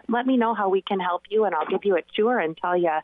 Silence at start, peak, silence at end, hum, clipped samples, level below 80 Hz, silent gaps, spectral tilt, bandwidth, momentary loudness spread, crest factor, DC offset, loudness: 0.1 s; -14 dBFS; 0 s; none; under 0.1%; -70 dBFS; none; -9 dB/octave; 3.9 kHz; 3 LU; 10 dB; under 0.1%; -23 LUFS